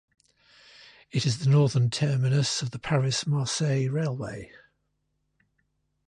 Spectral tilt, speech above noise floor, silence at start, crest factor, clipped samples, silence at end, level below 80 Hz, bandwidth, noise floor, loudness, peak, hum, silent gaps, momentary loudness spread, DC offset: -5.5 dB/octave; 51 dB; 1.15 s; 16 dB; under 0.1%; 1.65 s; -60 dBFS; 10.5 kHz; -76 dBFS; -26 LUFS; -12 dBFS; none; none; 10 LU; under 0.1%